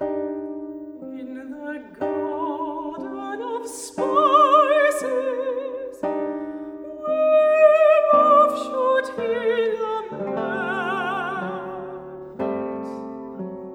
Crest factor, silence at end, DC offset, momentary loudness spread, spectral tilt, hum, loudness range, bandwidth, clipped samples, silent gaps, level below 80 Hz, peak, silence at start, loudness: 18 dB; 0 s; under 0.1%; 19 LU; -4.5 dB/octave; none; 11 LU; 14.5 kHz; under 0.1%; none; -66 dBFS; -4 dBFS; 0 s; -21 LUFS